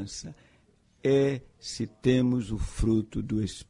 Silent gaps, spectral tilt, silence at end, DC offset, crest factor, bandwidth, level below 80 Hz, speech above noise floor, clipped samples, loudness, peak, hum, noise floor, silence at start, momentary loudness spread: none; -6.5 dB/octave; 0.05 s; under 0.1%; 18 dB; 11 kHz; -40 dBFS; 36 dB; under 0.1%; -28 LUFS; -10 dBFS; none; -63 dBFS; 0 s; 14 LU